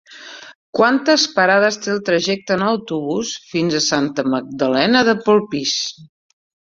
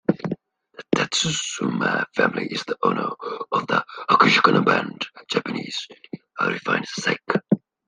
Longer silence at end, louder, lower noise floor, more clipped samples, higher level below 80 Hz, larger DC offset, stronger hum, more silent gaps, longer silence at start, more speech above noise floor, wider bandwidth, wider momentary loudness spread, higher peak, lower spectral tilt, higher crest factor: first, 0.6 s vs 0.3 s; first, -17 LUFS vs -22 LUFS; second, -38 dBFS vs -45 dBFS; neither; about the same, -60 dBFS vs -64 dBFS; neither; neither; first, 0.55-0.73 s vs none; about the same, 0.1 s vs 0.1 s; about the same, 21 dB vs 23 dB; second, 7.8 kHz vs 10 kHz; second, 10 LU vs 14 LU; about the same, 0 dBFS vs 0 dBFS; about the same, -3.5 dB/octave vs -4 dB/octave; about the same, 18 dB vs 22 dB